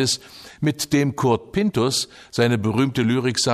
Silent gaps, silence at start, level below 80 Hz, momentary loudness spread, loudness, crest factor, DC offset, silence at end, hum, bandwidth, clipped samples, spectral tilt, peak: none; 0 s; -54 dBFS; 6 LU; -21 LUFS; 16 dB; under 0.1%; 0 s; none; 15.5 kHz; under 0.1%; -4.5 dB/octave; -6 dBFS